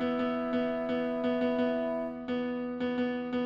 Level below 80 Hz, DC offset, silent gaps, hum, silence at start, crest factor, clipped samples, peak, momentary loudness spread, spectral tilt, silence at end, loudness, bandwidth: -62 dBFS; under 0.1%; none; none; 0 s; 12 dB; under 0.1%; -18 dBFS; 5 LU; -7.5 dB/octave; 0 s; -32 LUFS; 5.6 kHz